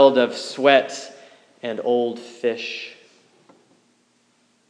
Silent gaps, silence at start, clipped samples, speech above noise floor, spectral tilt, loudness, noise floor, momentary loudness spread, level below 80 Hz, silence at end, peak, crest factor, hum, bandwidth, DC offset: none; 0 s; under 0.1%; 42 dB; -3.5 dB/octave; -21 LUFS; -63 dBFS; 18 LU; under -90 dBFS; 1.75 s; 0 dBFS; 22 dB; none; 10 kHz; under 0.1%